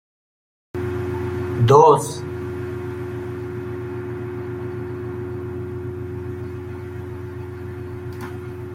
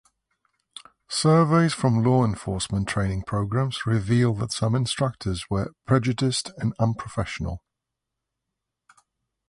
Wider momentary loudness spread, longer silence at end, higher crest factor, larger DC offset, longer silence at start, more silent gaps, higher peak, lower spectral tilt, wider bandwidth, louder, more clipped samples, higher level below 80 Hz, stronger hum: first, 17 LU vs 10 LU; second, 0 s vs 1.9 s; about the same, 22 dB vs 18 dB; neither; second, 0.75 s vs 1.1 s; neither; first, -2 dBFS vs -8 dBFS; about the same, -7 dB/octave vs -6 dB/octave; first, 15.5 kHz vs 11.5 kHz; about the same, -24 LUFS vs -24 LUFS; neither; second, -56 dBFS vs -46 dBFS; neither